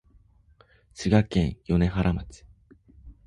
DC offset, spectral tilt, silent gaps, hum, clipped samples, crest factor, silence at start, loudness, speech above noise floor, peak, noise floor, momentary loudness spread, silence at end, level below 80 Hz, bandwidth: under 0.1%; -7.5 dB/octave; none; none; under 0.1%; 20 dB; 0.95 s; -25 LUFS; 35 dB; -8 dBFS; -59 dBFS; 11 LU; 0.15 s; -40 dBFS; 11 kHz